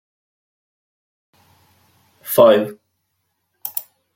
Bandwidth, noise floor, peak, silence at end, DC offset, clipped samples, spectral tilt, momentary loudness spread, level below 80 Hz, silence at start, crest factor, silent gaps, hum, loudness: 16.5 kHz; -72 dBFS; -2 dBFS; 0.35 s; under 0.1%; under 0.1%; -4.5 dB/octave; 19 LU; -70 dBFS; 2.25 s; 20 dB; none; none; -17 LUFS